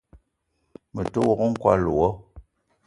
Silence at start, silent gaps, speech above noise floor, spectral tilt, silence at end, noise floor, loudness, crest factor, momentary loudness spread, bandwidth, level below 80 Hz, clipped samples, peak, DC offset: 0.15 s; none; 52 dB; -8 dB/octave; 0.45 s; -73 dBFS; -23 LUFS; 22 dB; 14 LU; 11.5 kHz; -46 dBFS; under 0.1%; -4 dBFS; under 0.1%